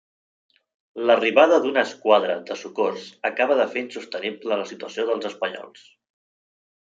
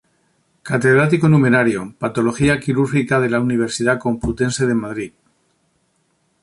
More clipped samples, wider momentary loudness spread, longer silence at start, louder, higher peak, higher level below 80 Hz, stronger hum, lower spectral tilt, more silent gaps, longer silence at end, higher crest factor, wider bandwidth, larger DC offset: neither; first, 13 LU vs 10 LU; first, 0.95 s vs 0.65 s; second, -22 LUFS vs -17 LUFS; about the same, -2 dBFS vs -2 dBFS; second, -80 dBFS vs -44 dBFS; neither; second, -4 dB/octave vs -6.5 dB/octave; neither; second, 1.15 s vs 1.35 s; first, 22 dB vs 16 dB; second, 7.8 kHz vs 11.5 kHz; neither